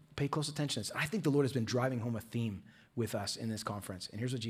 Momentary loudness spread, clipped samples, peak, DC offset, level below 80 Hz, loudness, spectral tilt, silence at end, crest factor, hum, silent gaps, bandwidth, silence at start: 9 LU; under 0.1%; -20 dBFS; under 0.1%; -70 dBFS; -36 LUFS; -5 dB/octave; 0 s; 16 dB; none; none; 16 kHz; 0.1 s